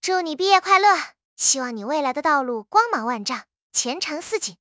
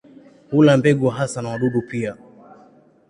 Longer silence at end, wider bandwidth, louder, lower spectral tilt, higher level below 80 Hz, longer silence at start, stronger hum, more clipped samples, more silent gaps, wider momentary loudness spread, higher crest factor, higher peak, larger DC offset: second, 0.1 s vs 0.95 s; second, 8 kHz vs 11 kHz; about the same, -21 LUFS vs -19 LUFS; second, -0.5 dB/octave vs -7 dB/octave; second, -72 dBFS vs -58 dBFS; second, 0.05 s vs 0.5 s; neither; neither; first, 1.25-1.36 s, 3.62-3.70 s vs none; about the same, 11 LU vs 13 LU; about the same, 20 dB vs 18 dB; about the same, -2 dBFS vs -2 dBFS; neither